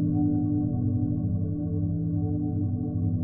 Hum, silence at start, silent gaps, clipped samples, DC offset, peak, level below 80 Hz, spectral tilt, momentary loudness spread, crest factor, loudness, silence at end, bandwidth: none; 0 s; none; under 0.1%; under 0.1%; -14 dBFS; -44 dBFS; -11.5 dB/octave; 4 LU; 12 dB; -27 LUFS; 0 s; 1.6 kHz